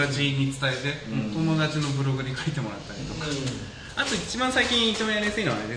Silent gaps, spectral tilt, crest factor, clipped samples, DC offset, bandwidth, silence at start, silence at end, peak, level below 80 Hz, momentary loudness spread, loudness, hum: none; -4.5 dB/octave; 16 dB; under 0.1%; under 0.1%; 10.5 kHz; 0 s; 0 s; -10 dBFS; -48 dBFS; 11 LU; -26 LUFS; none